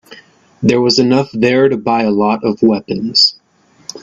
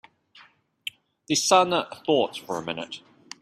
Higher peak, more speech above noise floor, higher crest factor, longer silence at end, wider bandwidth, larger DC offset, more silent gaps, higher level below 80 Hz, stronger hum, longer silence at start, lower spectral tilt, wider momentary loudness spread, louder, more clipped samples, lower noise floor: first, 0 dBFS vs -6 dBFS; first, 39 dB vs 32 dB; second, 14 dB vs 22 dB; second, 0.05 s vs 0.45 s; second, 8 kHz vs 15.5 kHz; neither; neither; first, -54 dBFS vs -70 dBFS; neither; second, 0.1 s vs 1.3 s; first, -5 dB/octave vs -2.5 dB/octave; second, 7 LU vs 18 LU; first, -12 LUFS vs -24 LUFS; neither; second, -51 dBFS vs -56 dBFS